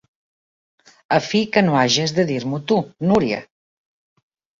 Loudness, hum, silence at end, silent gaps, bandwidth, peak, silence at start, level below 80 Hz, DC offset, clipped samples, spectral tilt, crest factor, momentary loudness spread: -19 LUFS; none; 1.15 s; none; 7.6 kHz; -2 dBFS; 1.1 s; -56 dBFS; under 0.1%; under 0.1%; -5 dB/octave; 20 dB; 7 LU